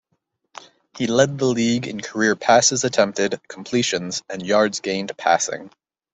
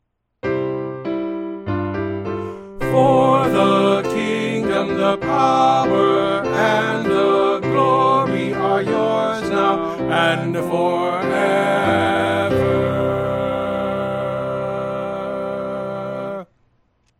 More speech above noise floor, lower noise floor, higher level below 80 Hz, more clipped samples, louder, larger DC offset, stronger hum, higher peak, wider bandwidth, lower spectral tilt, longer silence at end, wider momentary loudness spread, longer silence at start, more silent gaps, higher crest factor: first, 52 dB vs 46 dB; first, -72 dBFS vs -62 dBFS; second, -62 dBFS vs -48 dBFS; neither; about the same, -20 LUFS vs -19 LUFS; neither; neither; about the same, -2 dBFS vs -2 dBFS; second, 8.4 kHz vs 15.5 kHz; second, -3.5 dB/octave vs -6.5 dB/octave; second, 0.45 s vs 0.75 s; about the same, 12 LU vs 10 LU; first, 0.95 s vs 0.45 s; neither; about the same, 20 dB vs 16 dB